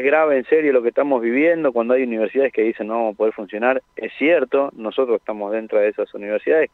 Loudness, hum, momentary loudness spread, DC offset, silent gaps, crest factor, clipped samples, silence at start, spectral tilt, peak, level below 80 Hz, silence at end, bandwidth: -19 LUFS; none; 7 LU; under 0.1%; none; 16 dB; under 0.1%; 0 s; -7.5 dB/octave; -4 dBFS; -68 dBFS; 0.05 s; 4.1 kHz